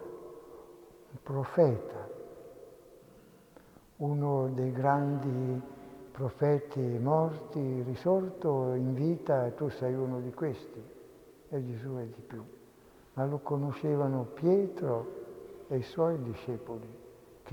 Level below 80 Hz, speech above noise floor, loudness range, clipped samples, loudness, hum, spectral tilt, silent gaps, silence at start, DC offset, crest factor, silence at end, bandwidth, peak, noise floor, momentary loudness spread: -68 dBFS; 27 dB; 6 LU; under 0.1%; -32 LUFS; none; -9.5 dB/octave; none; 0 s; under 0.1%; 20 dB; 0 s; 19 kHz; -12 dBFS; -58 dBFS; 20 LU